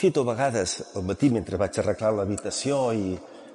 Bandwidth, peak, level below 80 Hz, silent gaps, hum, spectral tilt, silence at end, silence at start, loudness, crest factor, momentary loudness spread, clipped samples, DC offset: 11.5 kHz; -10 dBFS; -58 dBFS; none; none; -5 dB/octave; 0 s; 0 s; -26 LUFS; 16 dB; 7 LU; under 0.1%; under 0.1%